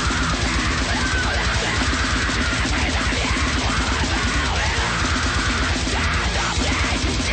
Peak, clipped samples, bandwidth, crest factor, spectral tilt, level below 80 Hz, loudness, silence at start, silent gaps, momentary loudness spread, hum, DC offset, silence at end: -10 dBFS; under 0.1%; 9.2 kHz; 10 dB; -3.5 dB/octave; -26 dBFS; -20 LUFS; 0 s; none; 1 LU; none; under 0.1%; 0 s